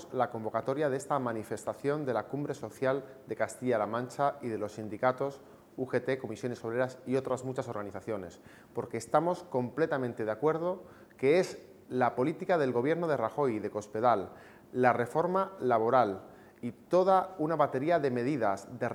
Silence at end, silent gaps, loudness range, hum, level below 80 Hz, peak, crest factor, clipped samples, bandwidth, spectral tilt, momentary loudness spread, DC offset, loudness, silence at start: 0 s; none; 5 LU; none; -74 dBFS; -10 dBFS; 22 dB; under 0.1%; 16.5 kHz; -6.5 dB/octave; 11 LU; under 0.1%; -31 LUFS; 0 s